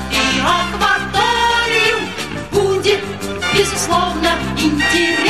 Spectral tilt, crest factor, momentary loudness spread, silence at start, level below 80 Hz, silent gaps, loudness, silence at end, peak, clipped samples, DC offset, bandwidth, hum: -3 dB/octave; 14 dB; 6 LU; 0 s; -34 dBFS; none; -15 LUFS; 0 s; -2 dBFS; under 0.1%; 0.8%; 15 kHz; none